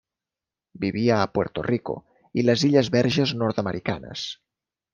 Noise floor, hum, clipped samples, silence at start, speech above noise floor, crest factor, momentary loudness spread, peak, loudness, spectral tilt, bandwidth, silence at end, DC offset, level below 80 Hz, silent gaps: -89 dBFS; none; under 0.1%; 0.75 s; 67 dB; 20 dB; 13 LU; -4 dBFS; -24 LUFS; -6 dB/octave; 7.4 kHz; 0.6 s; under 0.1%; -58 dBFS; none